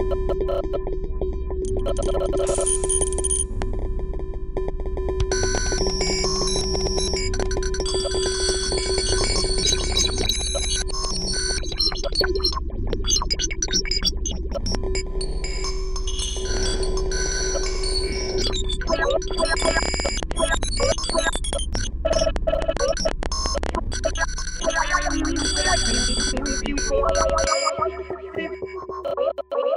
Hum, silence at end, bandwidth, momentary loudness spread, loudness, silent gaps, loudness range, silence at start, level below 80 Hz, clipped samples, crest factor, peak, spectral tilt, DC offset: none; 0 s; 13.5 kHz; 9 LU; -23 LUFS; none; 3 LU; 0 s; -26 dBFS; under 0.1%; 18 dB; -6 dBFS; -3 dB/octave; under 0.1%